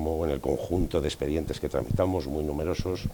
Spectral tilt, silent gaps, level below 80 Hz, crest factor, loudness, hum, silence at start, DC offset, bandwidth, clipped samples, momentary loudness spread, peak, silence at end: -7 dB/octave; none; -40 dBFS; 18 dB; -29 LUFS; none; 0 s; under 0.1%; 19.5 kHz; under 0.1%; 4 LU; -10 dBFS; 0 s